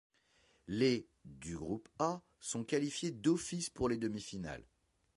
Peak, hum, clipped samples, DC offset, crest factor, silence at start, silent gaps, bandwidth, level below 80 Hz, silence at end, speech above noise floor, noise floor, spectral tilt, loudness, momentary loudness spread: -20 dBFS; none; under 0.1%; under 0.1%; 20 dB; 0.7 s; none; 11.5 kHz; -64 dBFS; 0.55 s; 35 dB; -72 dBFS; -5 dB/octave; -38 LUFS; 13 LU